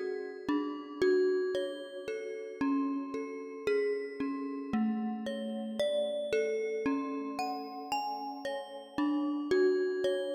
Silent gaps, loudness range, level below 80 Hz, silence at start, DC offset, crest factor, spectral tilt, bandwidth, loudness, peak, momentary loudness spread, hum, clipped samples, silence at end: none; 2 LU; -70 dBFS; 0 s; under 0.1%; 16 dB; -5.5 dB/octave; 16 kHz; -34 LUFS; -18 dBFS; 10 LU; none; under 0.1%; 0 s